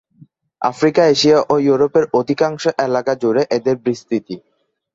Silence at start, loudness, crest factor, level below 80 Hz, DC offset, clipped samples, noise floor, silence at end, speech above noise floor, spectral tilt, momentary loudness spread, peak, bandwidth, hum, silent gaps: 0.6 s; -16 LUFS; 14 dB; -58 dBFS; under 0.1%; under 0.1%; -49 dBFS; 0.55 s; 33 dB; -5 dB/octave; 10 LU; -2 dBFS; 7.8 kHz; none; none